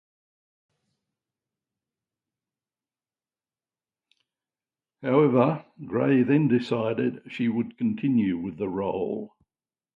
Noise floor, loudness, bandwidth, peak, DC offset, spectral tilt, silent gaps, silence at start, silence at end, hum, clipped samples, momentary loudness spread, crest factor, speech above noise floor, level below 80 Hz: under -90 dBFS; -25 LUFS; 7.2 kHz; -8 dBFS; under 0.1%; -9.5 dB/octave; none; 5 s; 0.7 s; none; under 0.1%; 11 LU; 20 dB; over 66 dB; -66 dBFS